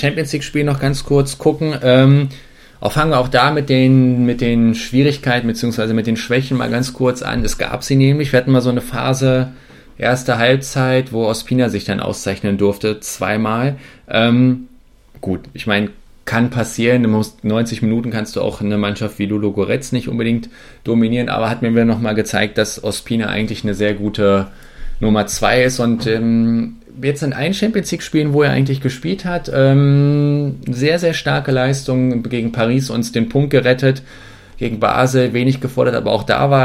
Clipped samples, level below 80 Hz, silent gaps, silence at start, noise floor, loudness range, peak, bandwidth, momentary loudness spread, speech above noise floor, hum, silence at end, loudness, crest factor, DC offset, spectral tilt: under 0.1%; -36 dBFS; none; 0 s; -44 dBFS; 4 LU; 0 dBFS; 15.5 kHz; 8 LU; 28 dB; none; 0 s; -16 LUFS; 16 dB; under 0.1%; -6 dB/octave